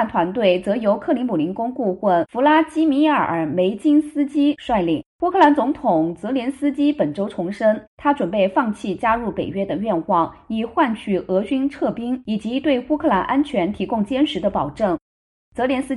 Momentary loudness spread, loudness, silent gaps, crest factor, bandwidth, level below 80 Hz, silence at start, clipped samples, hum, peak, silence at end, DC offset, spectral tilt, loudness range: 7 LU; -20 LUFS; 5.06-5.19 s, 7.87-7.98 s, 15.01-15.52 s; 16 dB; 11.5 kHz; -50 dBFS; 0 s; under 0.1%; none; -2 dBFS; 0 s; under 0.1%; -7 dB/octave; 3 LU